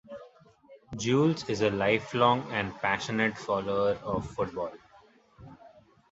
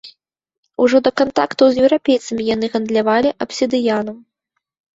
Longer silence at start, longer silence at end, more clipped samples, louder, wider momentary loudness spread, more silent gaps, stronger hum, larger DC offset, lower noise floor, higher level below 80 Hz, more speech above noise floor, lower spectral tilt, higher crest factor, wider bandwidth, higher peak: about the same, 0.1 s vs 0.05 s; second, 0.45 s vs 0.75 s; neither; second, -28 LUFS vs -16 LUFS; first, 12 LU vs 7 LU; second, none vs 0.58-0.63 s; neither; neither; second, -59 dBFS vs -75 dBFS; about the same, -58 dBFS vs -54 dBFS; second, 31 dB vs 60 dB; about the same, -5.5 dB/octave vs -4.5 dB/octave; first, 22 dB vs 16 dB; about the same, 8 kHz vs 8 kHz; second, -8 dBFS vs -2 dBFS